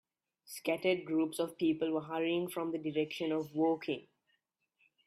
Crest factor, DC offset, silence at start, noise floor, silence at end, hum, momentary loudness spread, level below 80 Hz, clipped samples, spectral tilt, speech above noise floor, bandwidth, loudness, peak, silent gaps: 18 dB; under 0.1%; 0.5 s; -80 dBFS; 1.05 s; none; 6 LU; -80 dBFS; under 0.1%; -5.5 dB/octave; 46 dB; 15 kHz; -35 LUFS; -18 dBFS; none